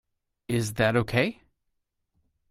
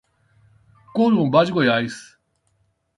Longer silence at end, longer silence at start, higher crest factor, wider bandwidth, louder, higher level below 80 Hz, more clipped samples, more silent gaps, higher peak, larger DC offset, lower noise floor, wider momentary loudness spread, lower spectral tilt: first, 1.2 s vs 0.95 s; second, 0.5 s vs 0.95 s; about the same, 22 dB vs 18 dB; first, 16 kHz vs 11.5 kHz; second, -26 LUFS vs -19 LUFS; first, -54 dBFS vs -62 dBFS; neither; neither; second, -8 dBFS vs -4 dBFS; neither; first, -78 dBFS vs -67 dBFS; second, 6 LU vs 13 LU; about the same, -5.5 dB/octave vs -6.5 dB/octave